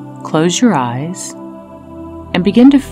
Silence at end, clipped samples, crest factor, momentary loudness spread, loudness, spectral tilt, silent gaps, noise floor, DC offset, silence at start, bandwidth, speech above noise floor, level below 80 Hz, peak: 0 s; 0.2%; 14 dB; 23 LU; -13 LUFS; -5 dB/octave; none; -32 dBFS; under 0.1%; 0 s; 14 kHz; 21 dB; -46 dBFS; 0 dBFS